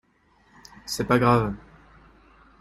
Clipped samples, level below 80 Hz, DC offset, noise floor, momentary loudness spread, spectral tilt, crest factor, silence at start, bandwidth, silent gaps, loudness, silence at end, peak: under 0.1%; -50 dBFS; under 0.1%; -62 dBFS; 21 LU; -6 dB/octave; 22 dB; 0.85 s; 16 kHz; none; -23 LUFS; 1 s; -4 dBFS